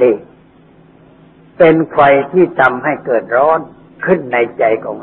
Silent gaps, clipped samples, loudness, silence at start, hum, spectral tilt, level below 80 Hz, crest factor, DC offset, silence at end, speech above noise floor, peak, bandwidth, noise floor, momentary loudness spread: none; under 0.1%; -13 LUFS; 0 s; none; -9 dB/octave; -52 dBFS; 14 dB; under 0.1%; 0 s; 33 dB; 0 dBFS; 4.2 kHz; -44 dBFS; 8 LU